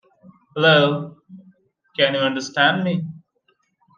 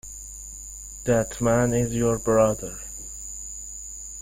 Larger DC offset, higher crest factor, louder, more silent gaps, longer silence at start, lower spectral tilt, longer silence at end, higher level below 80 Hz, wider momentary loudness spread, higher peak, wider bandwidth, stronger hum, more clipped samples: neither; about the same, 20 dB vs 18 dB; first, -18 LUFS vs -25 LUFS; neither; first, 0.55 s vs 0.05 s; about the same, -5 dB/octave vs -5.5 dB/octave; first, 0.8 s vs 0 s; second, -68 dBFS vs -44 dBFS; first, 19 LU vs 16 LU; first, -2 dBFS vs -8 dBFS; second, 9 kHz vs 16.5 kHz; neither; neither